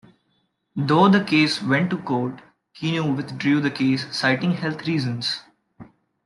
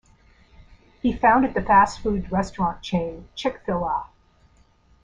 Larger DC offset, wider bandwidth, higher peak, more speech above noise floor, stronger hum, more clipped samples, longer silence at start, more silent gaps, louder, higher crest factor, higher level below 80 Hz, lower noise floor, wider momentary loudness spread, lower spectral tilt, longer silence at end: neither; first, 11.5 kHz vs 9.8 kHz; about the same, -4 dBFS vs -4 dBFS; first, 48 dB vs 36 dB; neither; neither; second, 0.75 s vs 1.05 s; neither; about the same, -21 LUFS vs -22 LUFS; about the same, 18 dB vs 20 dB; second, -64 dBFS vs -44 dBFS; first, -69 dBFS vs -57 dBFS; about the same, 11 LU vs 11 LU; about the same, -6 dB/octave vs -6 dB/octave; second, 0.4 s vs 0.95 s